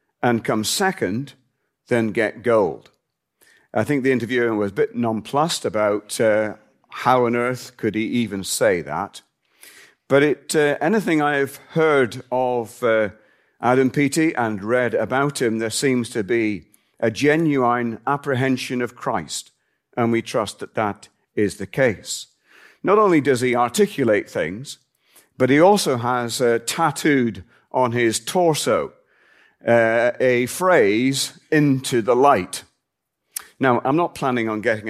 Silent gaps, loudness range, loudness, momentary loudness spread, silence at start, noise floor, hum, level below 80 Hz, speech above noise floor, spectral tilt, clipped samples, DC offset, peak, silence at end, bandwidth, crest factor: none; 4 LU; -20 LUFS; 10 LU; 0.2 s; -78 dBFS; none; -64 dBFS; 59 dB; -5 dB/octave; under 0.1%; under 0.1%; -2 dBFS; 0 s; 15.5 kHz; 18 dB